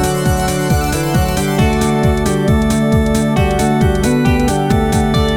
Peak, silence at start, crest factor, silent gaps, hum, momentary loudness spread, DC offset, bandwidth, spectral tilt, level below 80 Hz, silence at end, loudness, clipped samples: 0 dBFS; 0 s; 12 dB; none; none; 2 LU; under 0.1%; 19 kHz; -6 dB/octave; -22 dBFS; 0 s; -14 LUFS; under 0.1%